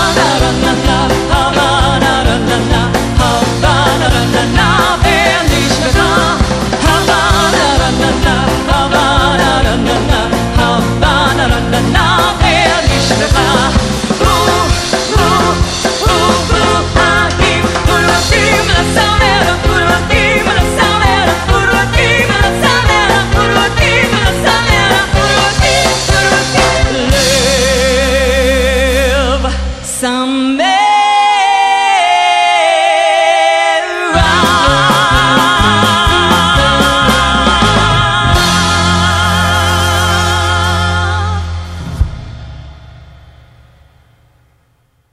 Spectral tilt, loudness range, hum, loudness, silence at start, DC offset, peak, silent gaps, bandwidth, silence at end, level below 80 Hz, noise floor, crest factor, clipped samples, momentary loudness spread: -4 dB/octave; 2 LU; none; -10 LUFS; 0 s; under 0.1%; 0 dBFS; none; 15.5 kHz; 2.1 s; -20 dBFS; -55 dBFS; 10 dB; under 0.1%; 4 LU